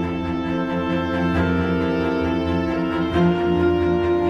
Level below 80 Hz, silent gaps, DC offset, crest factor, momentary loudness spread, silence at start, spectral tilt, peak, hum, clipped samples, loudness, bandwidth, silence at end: -38 dBFS; none; under 0.1%; 12 dB; 5 LU; 0 s; -8 dB/octave; -8 dBFS; none; under 0.1%; -21 LUFS; 7 kHz; 0 s